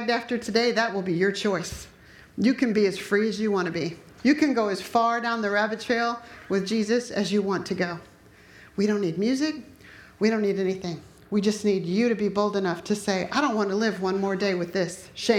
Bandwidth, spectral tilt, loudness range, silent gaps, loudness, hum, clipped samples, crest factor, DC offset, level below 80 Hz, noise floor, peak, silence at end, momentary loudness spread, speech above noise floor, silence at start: 15.5 kHz; -5 dB/octave; 3 LU; none; -25 LUFS; none; under 0.1%; 18 dB; under 0.1%; -60 dBFS; -51 dBFS; -6 dBFS; 0 s; 7 LU; 27 dB; 0 s